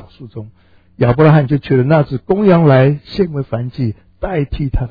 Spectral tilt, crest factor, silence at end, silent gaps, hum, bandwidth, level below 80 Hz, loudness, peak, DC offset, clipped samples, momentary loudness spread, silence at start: -11 dB/octave; 14 dB; 0 s; none; none; 5 kHz; -32 dBFS; -14 LUFS; 0 dBFS; 0.2%; 0.2%; 16 LU; 0.2 s